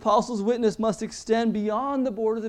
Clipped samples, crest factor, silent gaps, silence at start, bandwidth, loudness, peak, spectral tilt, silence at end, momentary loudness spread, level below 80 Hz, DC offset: under 0.1%; 16 dB; none; 0 s; 11 kHz; -25 LUFS; -8 dBFS; -5.5 dB/octave; 0 s; 4 LU; -56 dBFS; under 0.1%